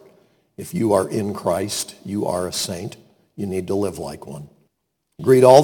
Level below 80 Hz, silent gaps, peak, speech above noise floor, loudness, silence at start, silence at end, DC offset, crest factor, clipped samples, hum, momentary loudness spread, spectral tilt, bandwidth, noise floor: -56 dBFS; none; 0 dBFS; 55 dB; -21 LUFS; 0.6 s; 0 s; under 0.1%; 20 dB; under 0.1%; none; 17 LU; -5 dB/octave; 19 kHz; -74 dBFS